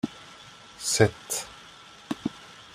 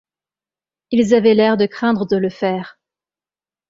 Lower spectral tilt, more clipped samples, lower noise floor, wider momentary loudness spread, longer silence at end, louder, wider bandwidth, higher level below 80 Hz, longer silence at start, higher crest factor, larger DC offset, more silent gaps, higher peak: second, -3.5 dB/octave vs -6.5 dB/octave; neither; second, -49 dBFS vs under -90 dBFS; first, 23 LU vs 9 LU; second, 0.15 s vs 1 s; second, -28 LUFS vs -16 LUFS; first, 16 kHz vs 7.8 kHz; about the same, -60 dBFS vs -58 dBFS; second, 0.05 s vs 0.9 s; first, 26 dB vs 16 dB; neither; neither; about the same, -4 dBFS vs -2 dBFS